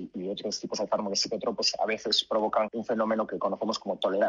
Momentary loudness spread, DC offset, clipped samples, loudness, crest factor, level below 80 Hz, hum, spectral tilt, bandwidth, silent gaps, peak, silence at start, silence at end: 7 LU; under 0.1%; under 0.1%; -29 LUFS; 18 dB; -70 dBFS; none; -3 dB/octave; 11.5 kHz; none; -10 dBFS; 0 s; 0 s